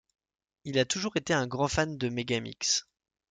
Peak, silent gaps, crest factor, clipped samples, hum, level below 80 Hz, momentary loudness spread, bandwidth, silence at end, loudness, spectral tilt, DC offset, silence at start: -12 dBFS; none; 20 dB; under 0.1%; none; -56 dBFS; 4 LU; 11 kHz; 0.5 s; -29 LUFS; -3.5 dB/octave; under 0.1%; 0.65 s